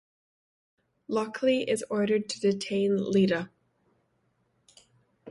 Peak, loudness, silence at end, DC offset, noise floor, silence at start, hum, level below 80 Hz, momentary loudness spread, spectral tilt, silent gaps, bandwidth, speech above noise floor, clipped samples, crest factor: -14 dBFS; -27 LUFS; 0 s; under 0.1%; -72 dBFS; 1.1 s; none; -72 dBFS; 7 LU; -5.5 dB/octave; none; 11.5 kHz; 46 dB; under 0.1%; 16 dB